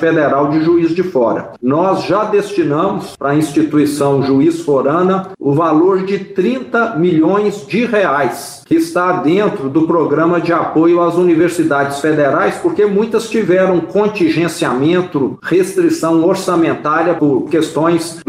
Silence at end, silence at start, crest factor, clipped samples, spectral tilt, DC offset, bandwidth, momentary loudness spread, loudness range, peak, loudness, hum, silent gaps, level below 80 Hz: 0.05 s; 0 s; 10 dB; under 0.1%; -6.5 dB/octave; under 0.1%; 15.5 kHz; 5 LU; 2 LU; -4 dBFS; -13 LUFS; none; none; -56 dBFS